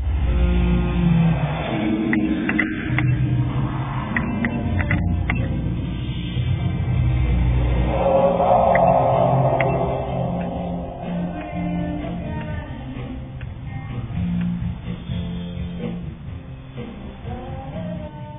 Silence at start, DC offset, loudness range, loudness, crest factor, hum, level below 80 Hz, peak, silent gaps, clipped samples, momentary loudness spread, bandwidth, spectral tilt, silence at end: 0 s; under 0.1%; 10 LU; -22 LUFS; 16 dB; none; -28 dBFS; -4 dBFS; none; under 0.1%; 15 LU; 3.9 kHz; -12.5 dB/octave; 0 s